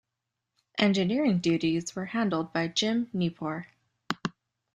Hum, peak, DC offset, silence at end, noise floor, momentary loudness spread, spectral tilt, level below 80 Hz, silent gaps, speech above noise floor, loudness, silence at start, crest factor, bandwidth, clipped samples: none; -10 dBFS; under 0.1%; 0.45 s; -85 dBFS; 11 LU; -5 dB/octave; -68 dBFS; none; 58 dB; -28 LUFS; 0.75 s; 20 dB; 10.5 kHz; under 0.1%